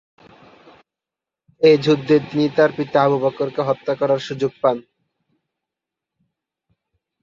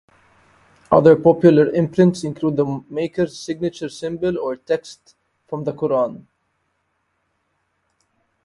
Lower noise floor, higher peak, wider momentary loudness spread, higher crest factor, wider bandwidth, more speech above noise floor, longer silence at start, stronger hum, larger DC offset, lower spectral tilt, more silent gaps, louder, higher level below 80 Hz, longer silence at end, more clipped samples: first, -87 dBFS vs -70 dBFS; about the same, -2 dBFS vs 0 dBFS; second, 7 LU vs 14 LU; about the same, 18 dB vs 20 dB; second, 7.4 kHz vs 11.5 kHz; first, 70 dB vs 52 dB; first, 1.6 s vs 0.9 s; neither; neither; about the same, -7 dB/octave vs -7.5 dB/octave; neither; about the same, -18 LUFS vs -18 LUFS; second, -64 dBFS vs -56 dBFS; first, 2.4 s vs 2.25 s; neither